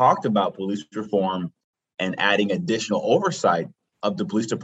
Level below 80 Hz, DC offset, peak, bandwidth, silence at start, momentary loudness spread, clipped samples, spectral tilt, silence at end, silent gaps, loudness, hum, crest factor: -72 dBFS; under 0.1%; -4 dBFS; 8.4 kHz; 0 s; 10 LU; under 0.1%; -5 dB/octave; 0 s; 1.64-1.73 s; -23 LUFS; none; 20 dB